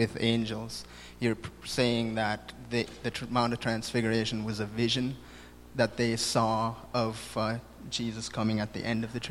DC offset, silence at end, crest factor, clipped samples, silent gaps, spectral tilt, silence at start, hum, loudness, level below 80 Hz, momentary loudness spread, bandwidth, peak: under 0.1%; 0 s; 20 dB; under 0.1%; none; -5 dB/octave; 0 s; none; -31 LUFS; -54 dBFS; 10 LU; 14 kHz; -10 dBFS